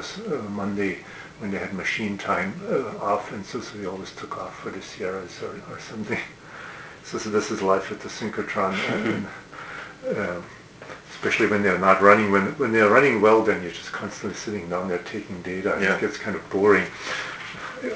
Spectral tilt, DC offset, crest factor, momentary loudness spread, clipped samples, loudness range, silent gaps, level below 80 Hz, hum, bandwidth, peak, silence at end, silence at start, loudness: -5 dB/octave; under 0.1%; 24 dB; 18 LU; under 0.1%; 12 LU; none; -56 dBFS; none; 8 kHz; 0 dBFS; 0 s; 0 s; -24 LUFS